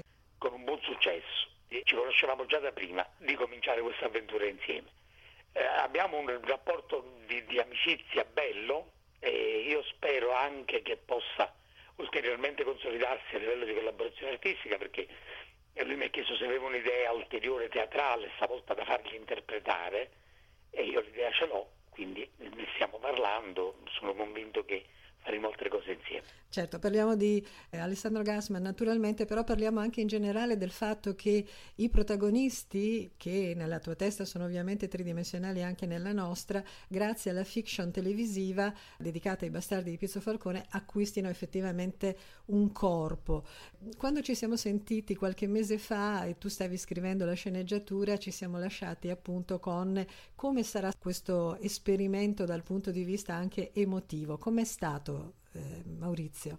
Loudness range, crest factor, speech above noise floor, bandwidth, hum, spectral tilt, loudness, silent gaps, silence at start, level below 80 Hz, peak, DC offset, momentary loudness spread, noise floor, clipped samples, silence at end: 4 LU; 22 dB; 28 dB; 16.5 kHz; none; -5 dB/octave; -34 LUFS; none; 0.4 s; -52 dBFS; -12 dBFS; under 0.1%; 9 LU; -61 dBFS; under 0.1%; 0 s